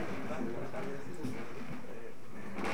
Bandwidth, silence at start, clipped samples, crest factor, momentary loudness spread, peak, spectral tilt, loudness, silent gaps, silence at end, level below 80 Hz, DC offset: over 20 kHz; 0 s; under 0.1%; 18 dB; 9 LU; -22 dBFS; -6 dB/octave; -43 LUFS; none; 0 s; -68 dBFS; 2%